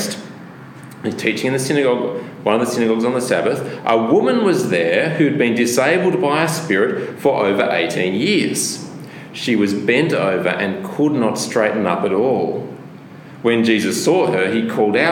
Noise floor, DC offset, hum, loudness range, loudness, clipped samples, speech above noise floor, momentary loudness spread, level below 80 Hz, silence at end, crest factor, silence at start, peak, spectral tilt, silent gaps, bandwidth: -37 dBFS; under 0.1%; none; 3 LU; -17 LUFS; under 0.1%; 20 dB; 11 LU; -66 dBFS; 0 s; 16 dB; 0 s; 0 dBFS; -4.5 dB/octave; none; 17.5 kHz